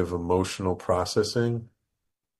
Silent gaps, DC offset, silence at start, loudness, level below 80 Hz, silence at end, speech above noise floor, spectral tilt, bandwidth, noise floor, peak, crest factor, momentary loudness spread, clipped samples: none; under 0.1%; 0 s; -27 LUFS; -52 dBFS; 0.75 s; 55 dB; -5.5 dB/octave; 12.5 kHz; -81 dBFS; -10 dBFS; 18 dB; 4 LU; under 0.1%